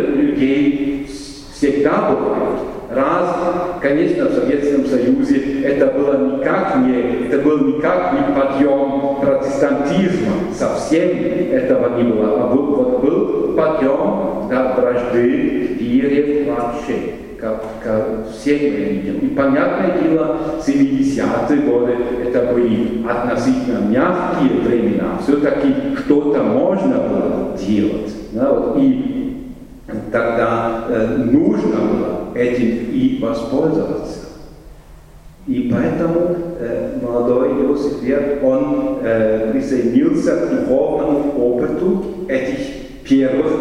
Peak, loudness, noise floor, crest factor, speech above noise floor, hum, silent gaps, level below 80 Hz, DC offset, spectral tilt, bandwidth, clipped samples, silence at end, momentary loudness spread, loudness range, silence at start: 0 dBFS; -17 LUFS; -40 dBFS; 16 dB; 24 dB; none; none; -40 dBFS; under 0.1%; -7.5 dB/octave; 11 kHz; under 0.1%; 0 s; 7 LU; 3 LU; 0 s